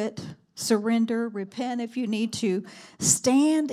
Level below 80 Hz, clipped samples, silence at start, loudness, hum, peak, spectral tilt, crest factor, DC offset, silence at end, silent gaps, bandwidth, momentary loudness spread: -68 dBFS; under 0.1%; 0 s; -25 LUFS; none; -8 dBFS; -3.5 dB/octave; 18 dB; under 0.1%; 0 s; none; 16 kHz; 12 LU